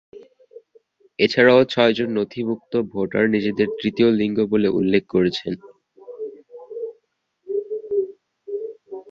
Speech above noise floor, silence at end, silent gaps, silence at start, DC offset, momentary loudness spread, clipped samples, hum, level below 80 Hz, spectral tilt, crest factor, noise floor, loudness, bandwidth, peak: 50 dB; 0.1 s; none; 0.15 s; under 0.1%; 19 LU; under 0.1%; none; -58 dBFS; -7 dB/octave; 20 dB; -69 dBFS; -20 LUFS; 7.4 kHz; -2 dBFS